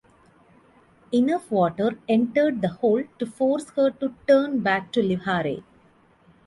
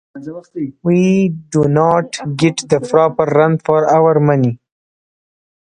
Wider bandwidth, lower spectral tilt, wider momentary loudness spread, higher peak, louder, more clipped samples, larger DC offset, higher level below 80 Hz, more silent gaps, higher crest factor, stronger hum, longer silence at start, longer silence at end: about the same, 11.5 kHz vs 10.5 kHz; about the same, -7 dB/octave vs -7 dB/octave; second, 6 LU vs 14 LU; second, -6 dBFS vs 0 dBFS; second, -23 LUFS vs -14 LUFS; neither; neither; second, -62 dBFS vs -52 dBFS; neither; about the same, 18 dB vs 14 dB; neither; first, 1.1 s vs 0.15 s; second, 0.85 s vs 1.25 s